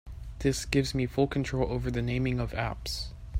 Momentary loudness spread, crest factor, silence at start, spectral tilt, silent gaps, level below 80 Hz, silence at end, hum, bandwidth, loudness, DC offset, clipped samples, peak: 7 LU; 20 dB; 0.05 s; -5.5 dB/octave; none; -40 dBFS; 0 s; none; 16 kHz; -30 LUFS; under 0.1%; under 0.1%; -10 dBFS